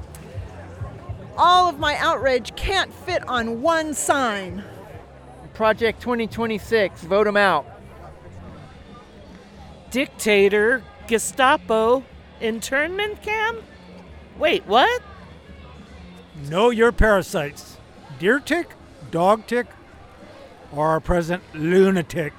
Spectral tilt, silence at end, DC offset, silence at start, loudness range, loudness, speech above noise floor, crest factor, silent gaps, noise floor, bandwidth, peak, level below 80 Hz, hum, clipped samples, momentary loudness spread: -4 dB/octave; 0.05 s; under 0.1%; 0 s; 4 LU; -20 LUFS; 24 dB; 20 dB; none; -44 dBFS; 19 kHz; -2 dBFS; -40 dBFS; none; under 0.1%; 20 LU